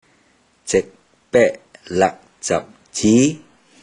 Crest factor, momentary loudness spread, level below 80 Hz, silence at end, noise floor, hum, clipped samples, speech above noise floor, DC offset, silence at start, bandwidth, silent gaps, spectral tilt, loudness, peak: 18 dB; 21 LU; -52 dBFS; 0.45 s; -58 dBFS; none; under 0.1%; 41 dB; under 0.1%; 0.65 s; 10.5 kHz; none; -4.5 dB/octave; -19 LUFS; -2 dBFS